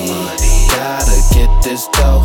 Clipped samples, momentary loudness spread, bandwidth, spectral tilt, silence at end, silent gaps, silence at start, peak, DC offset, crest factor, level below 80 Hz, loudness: under 0.1%; 4 LU; 18 kHz; -4 dB/octave; 0 s; none; 0 s; 0 dBFS; under 0.1%; 10 dB; -10 dBFS; -14 LUFS